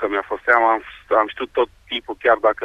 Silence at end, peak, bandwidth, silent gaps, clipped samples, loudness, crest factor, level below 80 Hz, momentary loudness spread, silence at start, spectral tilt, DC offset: 0 s; -2 dBFS; 8.4 kHz; none; under 0.1%; -19 LUFS; 18 dB; -52 dBFS; 8 LU; 0 s; -4.5 dB/octave; under 0.1%